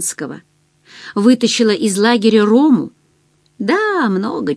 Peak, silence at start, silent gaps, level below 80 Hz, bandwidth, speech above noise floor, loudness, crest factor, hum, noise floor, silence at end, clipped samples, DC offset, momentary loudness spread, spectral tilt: 0 dBFS; 0 s; none; -64 dBFS; 11 kHz; 43 dB; -14 LUFS; 14 dB; none; -57 dBFS; 0 s; under 0.1%; under 0.1%; 15 LU; -4.5 dB/octave